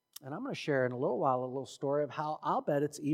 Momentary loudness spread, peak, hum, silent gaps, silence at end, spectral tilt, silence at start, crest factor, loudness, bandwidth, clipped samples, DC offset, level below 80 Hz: 8 LU; -16 dBFS; none; none; 0 s; -6 dB/octave; 0.2 s; 18 dB; -34 LUFS; 16.5 kHz; under 0.1%; under 0.1%; -88 dBFS